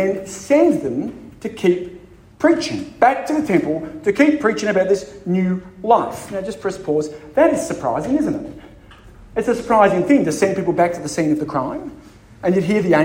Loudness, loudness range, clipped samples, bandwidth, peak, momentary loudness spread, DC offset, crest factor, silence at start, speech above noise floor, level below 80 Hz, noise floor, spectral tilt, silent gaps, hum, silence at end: -18 LUFS; 2 LU; under 0.1%; 16.5 kHz; 0 dBFS; 12 LU; under 0.1%; 18 dB; 0 s; 25 dB; -50 dBFS; -43 dBFS; -6 dB/octave; none; none; 0 s